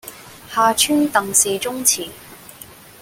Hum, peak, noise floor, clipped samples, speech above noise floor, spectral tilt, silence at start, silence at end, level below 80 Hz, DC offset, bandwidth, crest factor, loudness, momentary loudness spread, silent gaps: none; 0 dBFS; -41 dBFS; under 0.1%; 24 dB; -1.5 dB/octave; 0.05 s; 0.25 s; -56 dBFS; under 0.1%; 17 kHz; 20 dB; -17 LUFS; 22 LU; none